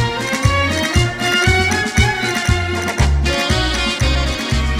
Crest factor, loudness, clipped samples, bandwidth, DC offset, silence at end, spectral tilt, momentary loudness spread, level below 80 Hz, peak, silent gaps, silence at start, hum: 14 dB; -16 LUFS; under 0.1%; 15.5 kHz; under 0.1%; 0 s; -4 dB/octave; 4 LU; -22 dBFS; 0 dBFS; none; 0 s; none